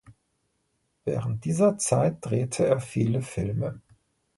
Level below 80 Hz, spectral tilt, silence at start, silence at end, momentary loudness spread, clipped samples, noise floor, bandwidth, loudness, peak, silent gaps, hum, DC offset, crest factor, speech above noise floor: -54 dBFS; -6.5 dB/octave; 0.1 s; 0.6 s; 9 LU; under 0.1%; -74 dBFS; 11.5 kHz; -26 LUFS; -8 dBFS; none; none; under 0.1%; 18 dB; 49 dB